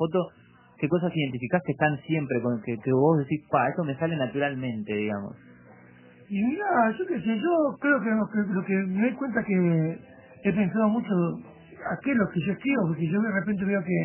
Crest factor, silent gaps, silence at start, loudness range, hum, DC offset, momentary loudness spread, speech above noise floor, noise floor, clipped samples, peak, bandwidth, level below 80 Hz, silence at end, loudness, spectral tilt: 18 dB; none; 0 s; 3 LU; none; under 0.1%; 7 LU; 26 dB; -52 dBFS; under 0.1%; -8 dBFS; 3.2 kHz; -62 dBFS; 0 s; -26 LUFS; -11.5 dB/octave